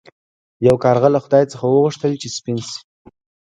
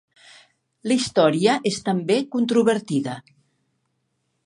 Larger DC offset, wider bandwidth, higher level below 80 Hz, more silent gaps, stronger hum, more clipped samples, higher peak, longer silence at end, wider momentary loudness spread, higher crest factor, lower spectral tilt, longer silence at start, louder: neither; about the same, 11 kHz vs 11.5 kHz; first, -52 dBFS vs -66 dBFS; neither; neither; neither; first, 0 dBFS vs -4 dBFS; second, 0.8 s vs 1.25 s; about the same, 11 LU vs 10 LU; about the same, 18 dB vs 20 dB; first, -6.5 dB/octave vs -5 dB/octave; second, 0.6 s vs 0.85 s; first, -17 LUFS vs -21 LUFS